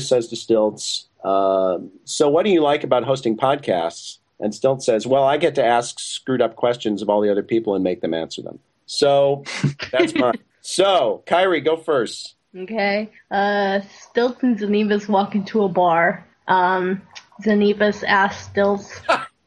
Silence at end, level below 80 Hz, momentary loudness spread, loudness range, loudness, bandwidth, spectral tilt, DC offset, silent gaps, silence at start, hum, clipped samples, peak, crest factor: 0.2 s; -64 dBFS; 11 LU; 2 LU; -20 LUFS; 12 kHz; -4.5 dB/octave; under 0.1%; none; 0 s; none; under 0.1%; -2 dBFS; 18 dB